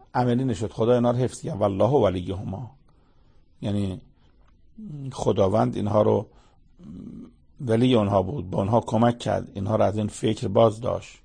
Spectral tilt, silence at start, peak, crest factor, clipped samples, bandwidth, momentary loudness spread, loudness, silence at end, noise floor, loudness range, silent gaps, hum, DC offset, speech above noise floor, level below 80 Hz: -7.5 dB/octave; 0.15 s; -6 dBFS; 20 dB; under 0.1%; 9.8 kHz; 20 LU; -24 LUFS; 0.1 s; -56 dBFS; 5 LU; none; none; under 0.1%; 33 dB; -52 dBFS